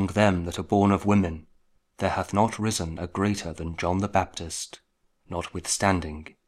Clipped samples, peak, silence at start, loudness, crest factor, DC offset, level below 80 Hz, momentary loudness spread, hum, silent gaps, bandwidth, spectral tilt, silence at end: under 0.1%; -6 dBFS; 0 s; -26 LUFS; 20 dB; under 0.1%; -46 dBFS; 12 LU; none; none; 14 kHz; -5 dB/octave; 0.2 s